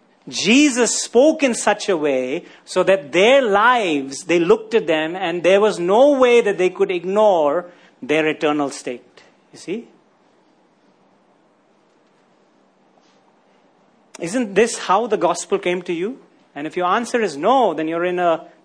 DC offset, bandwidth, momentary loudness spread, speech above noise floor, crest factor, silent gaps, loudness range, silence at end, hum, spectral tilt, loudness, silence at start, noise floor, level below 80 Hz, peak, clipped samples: under 0.1%; 10.5 kHz; 14 LU; 40 dB; 16 dB; none; 14 LU; 0.2 s; none; -3.5 dB/octave; -17 LUFS; 0.25 s; -57 dBFS; -66 dBFS; -2 dBFS; under 0.1%